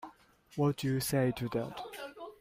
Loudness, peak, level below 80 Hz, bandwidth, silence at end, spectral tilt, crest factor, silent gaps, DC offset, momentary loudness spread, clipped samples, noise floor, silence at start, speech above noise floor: -34 LUFS; -18 dBFS; -62 dBFS; 16 kHz; 0.05 s; -6 dB/octave; 16 dB; none; under 0.1%; 14 LU; under 0.1%; -56 dBFS; 0 s; 24 dB